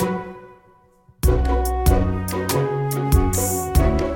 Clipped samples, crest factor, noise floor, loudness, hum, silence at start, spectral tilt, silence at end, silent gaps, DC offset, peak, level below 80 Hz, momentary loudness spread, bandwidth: under 0.1%; 16 dB; -54 dBFS; -21 LUFS; none; 0 s; -6 dB/octave; 0 s; none; under 0.1%; -2 dBFS; -24 dBFS; 6 LU; 17 kHz